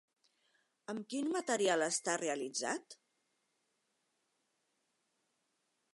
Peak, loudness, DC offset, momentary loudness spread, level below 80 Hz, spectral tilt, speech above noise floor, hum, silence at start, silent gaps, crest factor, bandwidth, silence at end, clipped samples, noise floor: -18 dBFS; -36 LUFS; under 0.1%; 13 LU; under -90 dBFS; -2 dB/octave; 46 dB; none; 0.9 s; none; 22 dB; 11.5 kHz; 3 s; under 0.1%; -82 dBFS